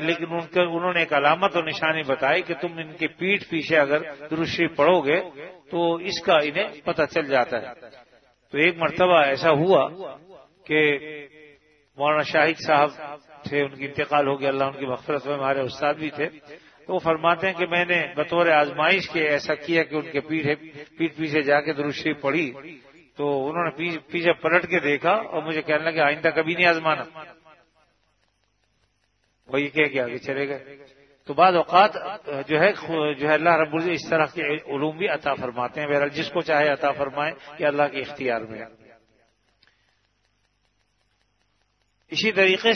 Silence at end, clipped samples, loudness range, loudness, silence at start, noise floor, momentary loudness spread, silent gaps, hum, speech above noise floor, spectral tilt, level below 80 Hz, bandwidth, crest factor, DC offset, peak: 0 s; under 0.1%; 6 LU; -22 LUFS; 0 s; -69 dBFS; 11 LU; none; none; 46 dB; -5.5 dB/octave; -66 dBFS; 6.6 kHz; 22 dB; under 0.1%; -2 dBFS